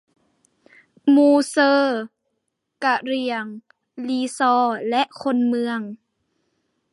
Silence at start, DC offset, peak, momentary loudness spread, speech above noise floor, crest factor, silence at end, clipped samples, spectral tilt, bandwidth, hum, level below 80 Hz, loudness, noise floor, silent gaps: 1.05 s; under 0.1%; -6 dBFS; 13 LU; 57 dB; 16 dB; 1 s; under 0.1%; -4 dB/octave; 11.5 kHz; none; -78 dBFS; -20 LUFS; -76 dBFS; none